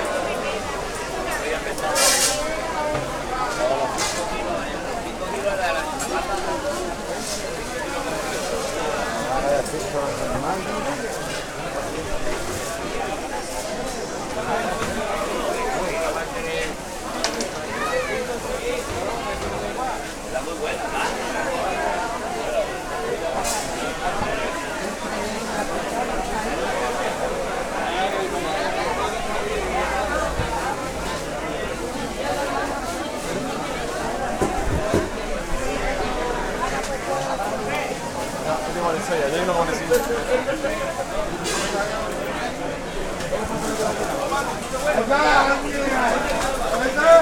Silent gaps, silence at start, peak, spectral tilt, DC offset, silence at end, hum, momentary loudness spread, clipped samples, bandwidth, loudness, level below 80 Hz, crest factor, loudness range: none; 0 s; -2 dBFS; -3 dB/octave; under 0.1%; 0 s; none; 6 LU; under 0.1%; 19 kHz; -24 LUFS; -36 dBFS; 22 dB; 5 LU